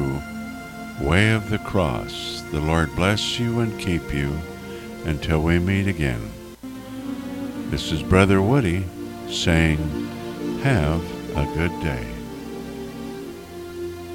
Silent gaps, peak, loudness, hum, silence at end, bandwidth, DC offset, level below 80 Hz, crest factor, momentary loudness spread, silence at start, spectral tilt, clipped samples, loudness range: none; -2 dBFS; -23 LUFS; none; 0 s; 17 kHz; under 0.1%; -36 dBFS; 22 dB; 16 LU; 0 s; -6 dB/octave; under 0.1%; 4 LU